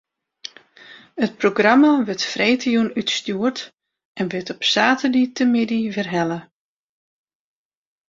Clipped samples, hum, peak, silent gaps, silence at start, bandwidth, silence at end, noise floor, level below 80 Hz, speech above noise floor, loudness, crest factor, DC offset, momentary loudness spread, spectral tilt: under 0.1%; none; 0 dBFS; 3.74-3.78 s, 4.05-4.15 s; 0.9 s; 7.8 kHz; 1.65 s; -46 dBFS; -64 dBFS; 27 dB; -19 LUFS; 20 dB; under 0.1%; 19 LU; -4.5 dB/octave